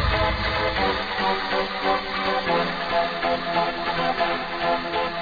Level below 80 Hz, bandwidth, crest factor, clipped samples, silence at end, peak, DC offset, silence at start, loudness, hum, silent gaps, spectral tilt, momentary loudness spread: -38 dBFS; 5 kHz; 14 dB; under 0.1%; 0 s; -8 dBFS; under 0.1%; 0 s; -23 LUFS; none; none; -6 dB/octave; 2 LU